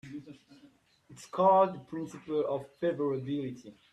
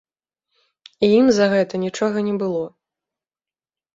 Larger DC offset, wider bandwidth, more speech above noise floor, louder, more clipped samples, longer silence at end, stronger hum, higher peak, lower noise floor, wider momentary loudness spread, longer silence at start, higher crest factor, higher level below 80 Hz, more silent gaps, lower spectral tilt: neither; first, 11.5 kHz vs 7.8 kHz; second, 32 dB vs over 72 dB; second, -31 LUFS vs -19 LUFS; neither; second, 0.2 s vs 1.3 s; neither; second, -12 dBFS vs -4 dBFS; second, -62 dBFS vs under -90 dBFS; first, 22 LU vs 10 LU; second, 0.05 s vs 1 s; about the same, 20 dB vs 18 dB; second, -74 dBFS vs -62 dBFS; neither; first, -7 dB/octave vs -5.5 dB/octave